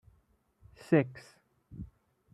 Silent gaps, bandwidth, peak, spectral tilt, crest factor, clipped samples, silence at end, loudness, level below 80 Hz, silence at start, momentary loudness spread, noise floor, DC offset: none; 12 kHz; -12 dBFS; -8.5 dB/octave; 24 dB; under 0.1%; 0.5 s; -30 LUFS; -62 dBFS; 0.9 s; 24 LU; -70 dBFS; under 0.1%